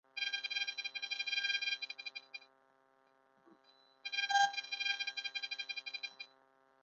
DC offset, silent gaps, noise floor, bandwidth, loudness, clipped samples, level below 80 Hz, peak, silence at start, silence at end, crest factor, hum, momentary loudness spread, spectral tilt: under 0.1%; none; -72 dBFS; 7.2 kHz; -37 LUFS; under 0.1%; under -90 dBFS; -20 dBFS; 0.15 s; 0.55 s; 22 dB; none; 16 LU; 6.5 dB/octave